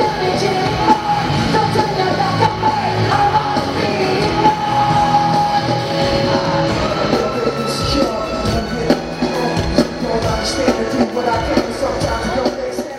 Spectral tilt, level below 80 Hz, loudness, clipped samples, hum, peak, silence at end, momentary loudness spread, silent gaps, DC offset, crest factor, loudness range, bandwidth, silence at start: -5.5 dB/octave; -34 dBFS; -16 LUFS; under 0.1%; none; 0 dBFS; 0 s; 5 LU; none; under 0.1%; 16 dB; 3 LU; 16 kHz; 0 s